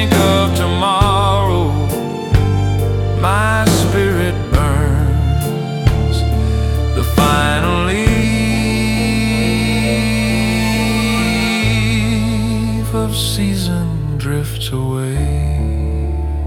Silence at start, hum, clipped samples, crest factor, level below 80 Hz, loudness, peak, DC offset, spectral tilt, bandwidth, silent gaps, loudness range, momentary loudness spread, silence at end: 0 s; none; under 0.1%; 14 dB; -22 dBFS; -15 LUFS; 0 dBFS; under 0.1%; -5.5 dB/octave; 18 kHz; none; 3 LU; 6 LU; 0 s